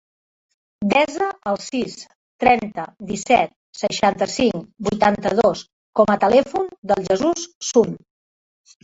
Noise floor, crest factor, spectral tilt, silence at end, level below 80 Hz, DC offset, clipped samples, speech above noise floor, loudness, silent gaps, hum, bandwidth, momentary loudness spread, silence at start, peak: under -90 dBFS; 18 dB; -4.5 dB/octave; 0.85 s; -52 dBFS; under 0.1%; under 0.1%; over 71 dB; -20 LUFS; 2.15-2.39 s, 3.56-3.73 s, 5.73-5.93 s, 6.78-6.82 s, 7.55-7.61 s; none; 8 kHz; 11 LU; 0.8 s; -2 dBFS